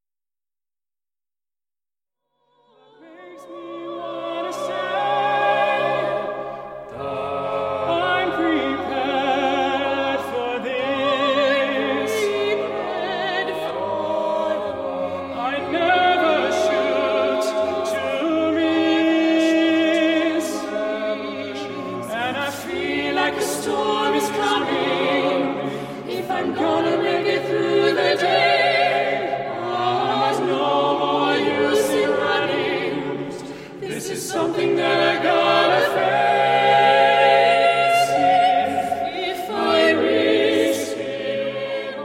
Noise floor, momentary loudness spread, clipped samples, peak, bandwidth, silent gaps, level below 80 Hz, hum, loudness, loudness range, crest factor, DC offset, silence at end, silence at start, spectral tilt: under -90 dBFS; 11 LU; under 0.1%; -4 dBFS; 16 kHz; none; -62 dBFS; none; -20 LUFS; 7 LU; 16 dB; under 0.1%; 0 s; 3 s; -4 dB/octave